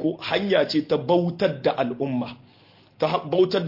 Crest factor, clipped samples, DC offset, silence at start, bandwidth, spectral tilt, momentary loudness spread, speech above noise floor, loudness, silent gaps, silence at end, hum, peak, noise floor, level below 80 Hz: 18 dB; under 0.1%; under 0.1%; 0 s; 5.8 kHz; -7 dB/octave; 6 LU; 32 dB; -23 LUFS; none; 0 s; none; -6 dBFS; -54 dBFS; -66 dBFS